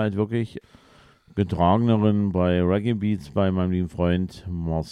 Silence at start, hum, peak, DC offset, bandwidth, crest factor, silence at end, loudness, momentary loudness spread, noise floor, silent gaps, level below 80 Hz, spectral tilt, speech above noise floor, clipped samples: 0 s; none; -6 dBFS; under 0.1%; 10 kHz; 16 dB; 0 s; -23 LUFS; 11 LU; -54 dBFS; none; -44 dBFS; -9 dB/octave; 32 dB; under 0.1%